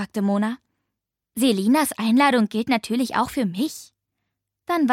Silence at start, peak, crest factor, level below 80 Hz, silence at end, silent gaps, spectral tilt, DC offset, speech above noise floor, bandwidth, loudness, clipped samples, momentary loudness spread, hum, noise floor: 0 s; -6 dBFS; 16 dB; -62 dBFS; 0 s; none; -4.5 dB/octave; under 0.1%; 62 dB; 16.5 kHz; -21 LUFS; under 0.1%; 13 LU; none; -83 dBFS